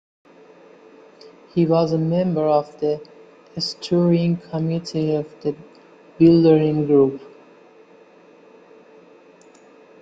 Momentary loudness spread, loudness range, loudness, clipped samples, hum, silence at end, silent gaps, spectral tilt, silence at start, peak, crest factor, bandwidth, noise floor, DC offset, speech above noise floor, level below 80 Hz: 14 LU; 4 LU; -19 LUFS; under 0.1%; none; 2.75 s; none; -8 dB/octave; 1.55 s; -4 dBFS; 18 dB; 7.8 kHz; -49 dBFS; under 0.1%; 31 dB; -60 dBFS